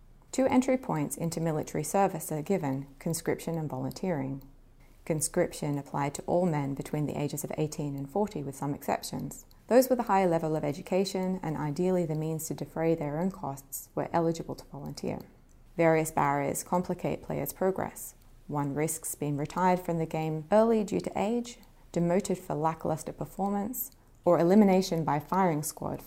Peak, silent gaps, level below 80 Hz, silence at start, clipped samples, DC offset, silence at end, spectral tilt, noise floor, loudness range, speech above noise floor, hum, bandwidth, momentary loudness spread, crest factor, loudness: -8 dBFS; none; -56 dBFS; 0.35 s; under 0.1%; under 0.1%; 0 s; -6 dB/octave; -55 dBFS; 5 LU; 26 dB; none; 16 kHz; 11 LU; 22 dB; -30 LUFS